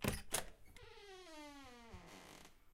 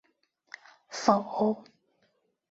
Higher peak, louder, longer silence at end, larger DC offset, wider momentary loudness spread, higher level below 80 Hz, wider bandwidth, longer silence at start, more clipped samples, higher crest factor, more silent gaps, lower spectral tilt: second, -20 dBFS vs -6 dBFS; second, -49 LUFS vs -28 LUFS; second, 0 s vs 0.9 s; neither; second, 17 LU vs 23 LU; first, -60 dBFS vs -72 dBFS; first, 16 kHz vs 8 kHz; second, 0 s vs 0.9 s; neither; about the same, 30 dB vs 26 dB; neither; second, -3 dB/octave vs -5 dB/octave